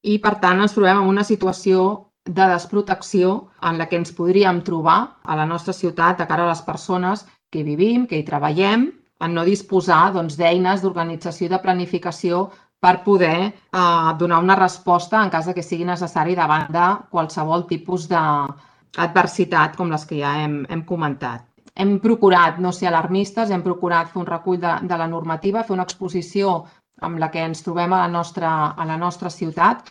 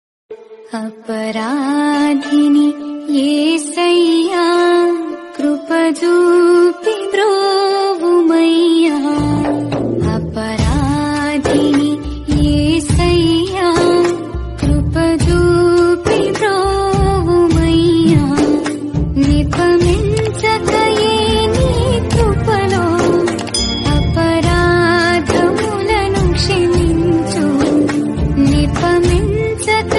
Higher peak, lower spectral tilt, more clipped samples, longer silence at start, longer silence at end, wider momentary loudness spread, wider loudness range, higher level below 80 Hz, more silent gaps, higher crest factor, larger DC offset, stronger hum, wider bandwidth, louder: about the same, 0 dBFS vs 0 dBFS; about the same, -6 dB/octave vs -6 dB/octave; neither; second, 0.05 s vs 0.3 s; about the same, 0 s vs 0 s; first, 9 LU vs 6 LU; about the same, 4 LU vs 2 LU; second, -62 dBFS vs -24 dBFS; neither; first, 18 dB vs 12 dB; neither; neither; about the same, 10.5 kHz vs 11.5 kHz; second, -19 LUFS vs -13 LUFS